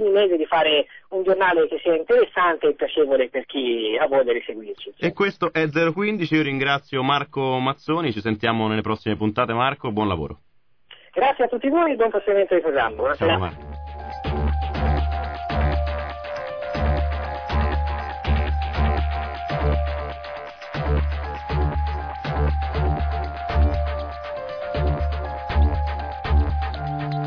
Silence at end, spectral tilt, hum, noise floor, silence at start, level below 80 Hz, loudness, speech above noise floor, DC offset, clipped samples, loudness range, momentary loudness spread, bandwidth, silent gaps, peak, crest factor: 0 s; -8 dB/octave; none; -51 dBFS; 0 s; -28 dBFS; -23 LUFS; 31 dB; 0.2%; under 0.1%; 5 LU; 10 LU; 5.4 kHz; none; -6 dBFS; 16 dB